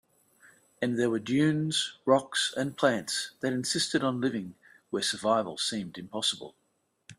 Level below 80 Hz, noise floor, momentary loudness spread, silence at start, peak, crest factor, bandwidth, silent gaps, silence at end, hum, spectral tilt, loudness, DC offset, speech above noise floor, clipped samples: -70 dBFS; -61 dBFS; 11 LU; 0.8 s; -10 dBFS; 20 dB; 14 kHz; none; 0.05 s; none; -4 dB/octave; -29 LUFS; under 0.1%; 32 dB; under 0.1%